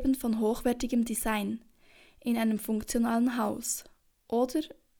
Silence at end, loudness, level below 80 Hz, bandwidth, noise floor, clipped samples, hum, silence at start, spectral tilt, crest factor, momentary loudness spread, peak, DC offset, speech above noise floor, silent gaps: 0.3 s; -30 LUFS; -50 dBFS; over 20 kHz; -59 dBFS; under 0.1%; none; 0 s; -4.5 dB/octave; 16 dB; 7 LU; -16 dBFS; under 0.1%; 30 dB; none